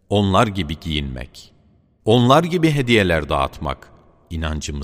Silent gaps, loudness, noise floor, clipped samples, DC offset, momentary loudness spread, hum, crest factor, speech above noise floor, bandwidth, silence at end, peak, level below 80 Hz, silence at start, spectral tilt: none; -18 LUFS; -55 dBFS; under 0.1%; under 0.1%; 16 LU; none; 20 dB; 37 dB; 15.5 kHz; 0 s; 0 dBFS; -34 dBFS; 0.1 s; -6 dB/octave